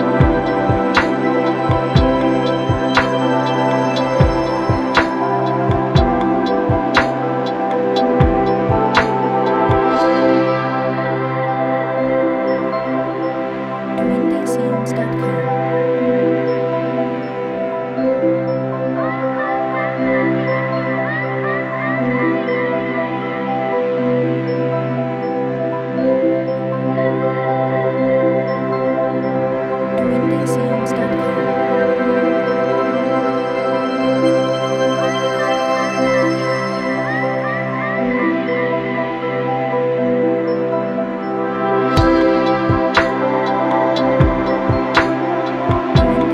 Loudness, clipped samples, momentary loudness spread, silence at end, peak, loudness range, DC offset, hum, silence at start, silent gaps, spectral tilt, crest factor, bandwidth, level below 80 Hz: -17 LUFS; under 0.1%; 5 LU; 0 s; 0 dBFS; 3 LU; under 0.1%; none; 0 s; none; -7 dB/octave; 16 dB; 11.5 kHz; -34 dBFS